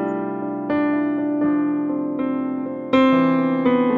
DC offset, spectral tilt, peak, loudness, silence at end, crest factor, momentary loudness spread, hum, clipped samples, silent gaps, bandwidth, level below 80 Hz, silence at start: under 0.1%; -8.5 dB/octave; -6 dBFS; -20 LUFS; 0 s; 14 dB; 9 LU; none; under 0.1%; none; 4.7 kHz; -60 dBFS; 0 s